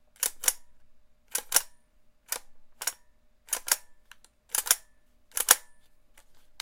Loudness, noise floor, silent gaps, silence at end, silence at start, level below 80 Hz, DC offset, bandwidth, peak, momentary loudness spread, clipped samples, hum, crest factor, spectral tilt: -28 LUFS; -60 dBFS; none; 0.2 s; 0.2 s; -62 dBFS; under 0.1%; 17 kHz; 0 dBFS; 14 LU; under 0.1%; none; 34 dB; 3 dB/octave